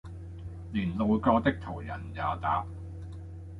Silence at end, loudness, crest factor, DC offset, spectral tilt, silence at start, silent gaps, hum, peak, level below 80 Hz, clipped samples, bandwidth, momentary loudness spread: 0 s; -30 LUFS; 20 dB; under 0.1%; -8.5 dB/octave; 0.05 s; none; none; -10 dBFS; -46 dBFS; under 0.1%; 5.4 kHz; 18 LU